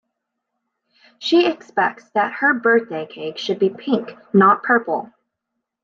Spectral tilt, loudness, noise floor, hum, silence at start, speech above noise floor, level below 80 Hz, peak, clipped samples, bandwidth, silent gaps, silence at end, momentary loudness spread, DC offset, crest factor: -6 dB/octave; -19 LUFS; -79 dBFS; none; 1.2 s; 60 dB; -72 dBFS; -2 dBFS; under 0.1%; 7.2 kHz; none; 0.8 s; 13 LU; under 0.1%; 18 dB